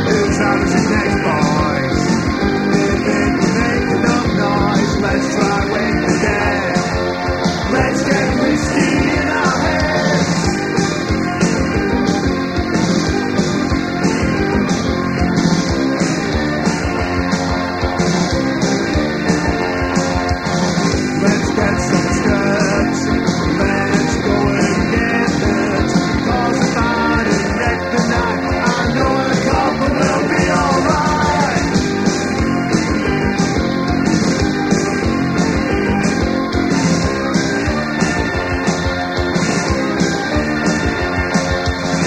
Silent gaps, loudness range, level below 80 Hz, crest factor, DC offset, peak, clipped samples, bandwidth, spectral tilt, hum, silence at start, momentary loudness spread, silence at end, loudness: none; 2 LU; -30 dBFS; 16 dB; under 0.1%; 0 dBFS; under 0.1%; 13 kHz; -5.5 dB/octave; none; 0 s; 3 LU; 0 s; -16 LUFS